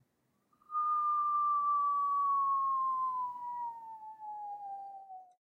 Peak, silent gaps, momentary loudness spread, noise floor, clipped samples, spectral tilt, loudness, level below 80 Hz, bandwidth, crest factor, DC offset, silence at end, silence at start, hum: -26 dBFS; none; 17 LU; -77 dBFS; under 0.1%; -4.5 dB/octave; -33 LUFS; under -90 dBFS; 2.5 kHz; 8 dB; under 0.1%; 0.15 s; 0.7 s; none